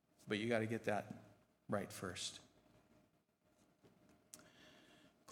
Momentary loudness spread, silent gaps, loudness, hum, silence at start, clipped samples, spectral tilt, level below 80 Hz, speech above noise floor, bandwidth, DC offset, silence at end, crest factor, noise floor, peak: 22 LU; none; -43 LUFS; none; 0.2 s; under 0.1%; -4.5 dB/octave; -84 dBFS; 36 dB; 18 kHz; under 0.1%; 0 s; 24 dB; -78 dBFS; -24 dBFS